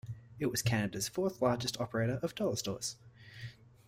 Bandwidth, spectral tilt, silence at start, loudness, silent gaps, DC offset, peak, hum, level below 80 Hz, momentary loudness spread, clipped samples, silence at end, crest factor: 16 kHz; -4.5 dB/octave; 0.05 s; -35 LUFS; none; under 0.1%; -16 dBFS; none; -62 dBFS; 17 LU; under 0.1%; 0.35 s; 18 dB